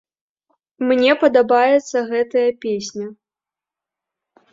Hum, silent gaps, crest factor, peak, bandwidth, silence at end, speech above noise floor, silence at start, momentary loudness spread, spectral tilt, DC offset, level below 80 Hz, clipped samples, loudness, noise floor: none; none; 18 dB; -2 dBFS; 7.8 kHz; 1.4 s; 72 dB; 0.8 s; 13 LU; -4 dB/octave; under 0.1%; -66 dBFS; under 0.1%; -17 LUFS; -89 dBFS